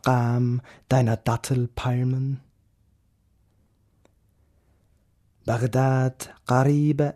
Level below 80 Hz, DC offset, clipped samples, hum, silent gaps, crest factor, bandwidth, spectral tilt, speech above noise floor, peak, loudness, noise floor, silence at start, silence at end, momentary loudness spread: -52 dBFS; under 0.1%; under 0.1%; none; none; 18 dB; 13.5 kHz; -7.5 dB/octave; 42 dB; -6 dBFS; -24 LUFS; -64 dBFS; 0.05 s; 0.05 s; 10 LU